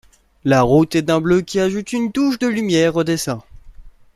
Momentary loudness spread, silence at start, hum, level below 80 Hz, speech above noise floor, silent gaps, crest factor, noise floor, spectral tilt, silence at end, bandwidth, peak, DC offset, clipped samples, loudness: 8 LU; 0.45 s; none; -44 dBFS; 23 dB; none; 16 dB; -39 dBFS; -5.5 dB/octave; 0.25 s; 14.5 kHz; -2 dBFS; under 0.1%; under 0.1%; -17 LUFS